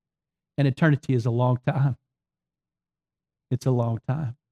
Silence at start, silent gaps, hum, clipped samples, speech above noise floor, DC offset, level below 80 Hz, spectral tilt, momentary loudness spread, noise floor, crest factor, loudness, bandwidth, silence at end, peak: 0.6 s; none; none; under 0.1%; over 67 dB; under 0.1%; -64 dBFS; -8.5 dB/octave; 9 LU; under -90 dBFS; 16 dB; -25 LUFS; 9.8 kHz; 0.2 s; -10 dBFS